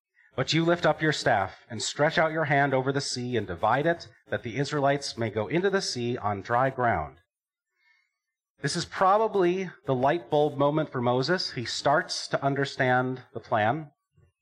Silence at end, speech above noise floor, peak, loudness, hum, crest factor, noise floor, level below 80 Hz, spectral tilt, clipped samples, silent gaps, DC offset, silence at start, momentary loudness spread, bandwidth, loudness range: 0.55 s; 62 dB; -10 dBFS; -26 LUFS; none; 16 dB; -88 dBFS; -60 dBFS; -5 dB/octave; under 0.1%; 8.50-8.55 s; under 0.1%; 0.35 s; 8 LU; 12 kHz; 3 LU